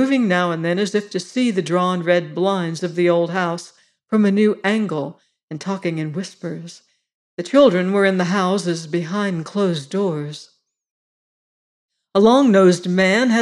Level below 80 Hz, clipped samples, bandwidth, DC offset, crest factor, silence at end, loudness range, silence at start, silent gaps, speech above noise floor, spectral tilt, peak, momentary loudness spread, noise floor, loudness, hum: -66 dBFS; under 0.1%; 11.5 kHz; under 0.1%; 16 dB; 0 s; 5 LU; 0 s; 5.43-5.48 s, 7.14-7.38 s, 10.91-11.89 s; over 72 dB; -6 dB/octave; -2 dBFS; 16 LU; under -90 dBFS; -18 LUFS; none